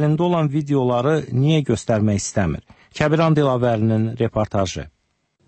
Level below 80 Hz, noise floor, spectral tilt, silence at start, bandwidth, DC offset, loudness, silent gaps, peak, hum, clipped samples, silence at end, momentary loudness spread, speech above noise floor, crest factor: -44 dBFS; -67 dBFS; -6.5 dB/octave; 0 s; 8.8 kHz; under 0.1%; -19 LUFS; none; -4 dBFS; none; under 0.1%; 0.6 s; 8 LU; 49 dB; 14 dB